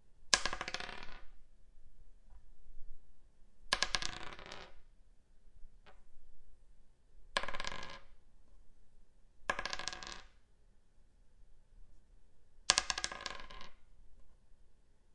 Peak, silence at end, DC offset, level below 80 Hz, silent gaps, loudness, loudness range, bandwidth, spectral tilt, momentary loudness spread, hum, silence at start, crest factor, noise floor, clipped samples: -2 dBFS; 0 s; under 0.1%; -56 dBFS; none; -37 LUFS; 8 LU; 11.5 kHz; 0 dB/octave; 23 LU; none; 0 s; 40 dB; -63 dBFS; under 0.1%